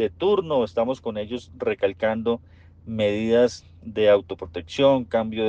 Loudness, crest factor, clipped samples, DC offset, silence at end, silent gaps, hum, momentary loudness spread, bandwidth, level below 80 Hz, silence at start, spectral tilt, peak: -23 LUFS; 16 dB; under 0.1%; under 0.1%; 0 s; none; none; 14 LU; 8.2 kHz; -56 dBFS; 0 s; -6 dB/octave; -6 dBFS